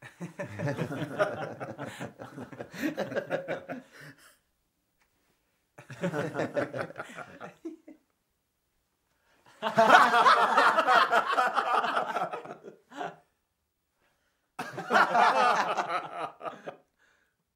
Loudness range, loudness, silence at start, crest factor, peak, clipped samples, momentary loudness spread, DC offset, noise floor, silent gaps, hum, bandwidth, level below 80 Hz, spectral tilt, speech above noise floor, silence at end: 15 LU; -26 LUFS; 0 s; 24 dB; -6 dBFS; under 0.1%; 23 LU; under 0.1%; -79 dBFS; none; none; 16 kHz; -78 dBFS; -4 dB/octave; 47 dB; 0.8 s